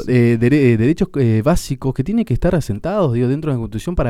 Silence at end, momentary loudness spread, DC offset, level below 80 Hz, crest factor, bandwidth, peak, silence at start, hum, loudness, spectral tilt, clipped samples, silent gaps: 0 s; 8 LU; under 0.1%; -30 dBFS; 14 dB; 14.5 kHz; -2 dBFS; 0 s; none; -17 LUFS; -8 dB/octave; under 0.1%; none